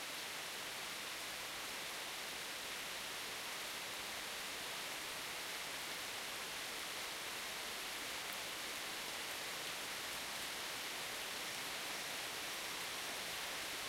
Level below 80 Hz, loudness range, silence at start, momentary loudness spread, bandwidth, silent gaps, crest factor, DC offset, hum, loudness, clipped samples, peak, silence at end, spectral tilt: -74 dBFS; 1 LU; 0 s; 2 LU; 16 kHz; none; 16 dB; under 0.1%; none; -43 LUFS; under 0.1%; -30 dBFS; 0 s; 0 dB/octave